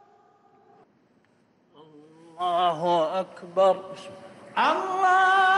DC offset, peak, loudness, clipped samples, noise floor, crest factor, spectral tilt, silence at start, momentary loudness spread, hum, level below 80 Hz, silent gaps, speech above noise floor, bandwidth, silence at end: under 0.1%; -12 dBFS; -24 LUFS; under 0.1%; -64 dBFS; 14 dB; -4 dB/octave; 2.35 s; 21 LU; none; -76 dBFS; none; 40 dB; 11.5 kHz; 0 s